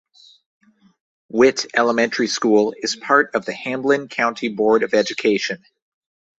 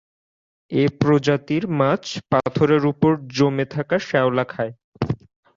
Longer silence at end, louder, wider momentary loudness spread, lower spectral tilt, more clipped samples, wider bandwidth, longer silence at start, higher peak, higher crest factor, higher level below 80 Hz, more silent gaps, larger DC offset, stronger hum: first, 0.85 s vs 0.4 s; about the same, -19 LUFS vs -21 LUFS; about the same, 8 LU vs 9 LU; second, -3.5 dB/octave vs -7 dB/octave; neither; about the same, 8 kHz vs 7.6 kHz; first, 1.35 s vs 0.7 s; about the same, -2 dBFS vs -4 dBFS; about the same, 18 dB vs 18 dB; second, -64 dBFS vs -52 dBFS; second, none vs 4.84-4.92 s; neither; neither